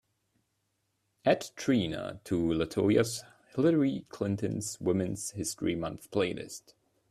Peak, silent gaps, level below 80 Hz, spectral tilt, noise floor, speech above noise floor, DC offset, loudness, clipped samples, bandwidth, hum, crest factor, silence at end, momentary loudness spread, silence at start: -10 dBFS; none; -62 dBFS; -5.5 dB/octave; -79 dBFS; 48 dB; under 0.1%; -31 LUFS; under 0.1%; 14 kHz; none; 20 dB; 0.5 s; 11 LU; 1.25 s